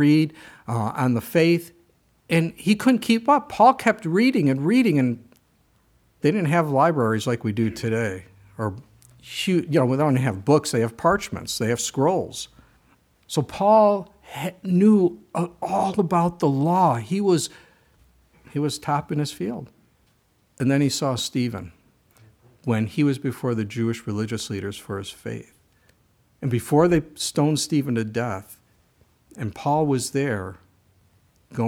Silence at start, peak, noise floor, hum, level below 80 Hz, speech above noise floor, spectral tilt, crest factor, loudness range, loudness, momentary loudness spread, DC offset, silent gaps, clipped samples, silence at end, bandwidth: 0 s; -4 dBFS; -63 dBFS; none; -58 dBFS; 42 dB; -6 dB/octave; 20 dB; 7 LU; -22 LUFS; 13 LU; under 0.1%; none; under 0.1%; 0 s; 17.5 kHz